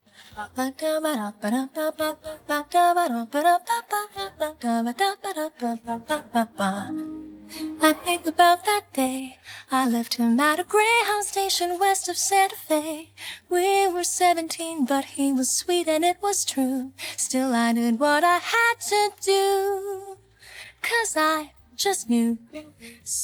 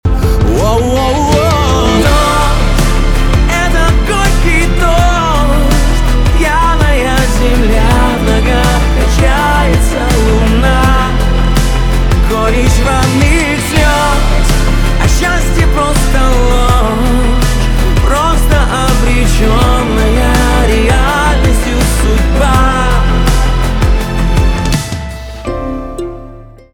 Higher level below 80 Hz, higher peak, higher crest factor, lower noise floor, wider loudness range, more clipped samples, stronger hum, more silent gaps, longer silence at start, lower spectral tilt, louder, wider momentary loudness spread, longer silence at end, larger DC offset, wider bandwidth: second, -64 dBFS vs -12 dBFS; second, -4 dBFS vs 0 dBFS; first, 20 dB vs 8 dB; first, -46 dBFS vs -31 dBFS; first, 4 LU vs 1 LU; neither; neither; neither; first, 0.2 s vs 0.05 s; second, -2 dB/octave vs -5 dB/octave; second, -23 LUFS vs -11 LUFS; first, 14 LU vs 3 LU; second, 0 s vs 0.25 s; neither; first, over 20 kHz vs 17 kHz